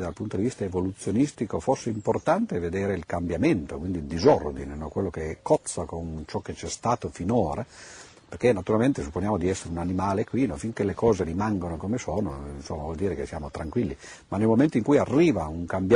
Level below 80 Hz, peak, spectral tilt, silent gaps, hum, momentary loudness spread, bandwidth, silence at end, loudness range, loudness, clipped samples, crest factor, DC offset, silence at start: -46 dBFS; -8 dBFS; -6.5 dB/octave; none; none; 12 LU; 10.5 kHz; 0 s; 3 LU; -27 LUFS; under 0.1%; 18 dB; under 0.1%; 0 s